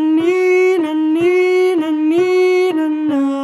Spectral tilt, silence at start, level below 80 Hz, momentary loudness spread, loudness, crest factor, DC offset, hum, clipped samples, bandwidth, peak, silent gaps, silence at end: -5 dB/octave; 0 s; -66 dBFS; 4 LU; -14 LUFS; 10 dB; under 0.1%; none; under 0.1%; 12 kHz; -4 dBFS; none; 0 s